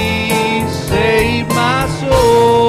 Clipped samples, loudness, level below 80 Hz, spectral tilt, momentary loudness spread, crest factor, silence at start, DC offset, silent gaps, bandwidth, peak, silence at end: under 0.1%; -13 LUFS; -28 dBFS; -5 dB/octave; 6 LU; 10 dB; 0 s; under 0.1%; none; 16 kHz; -2 dBFS; 0 s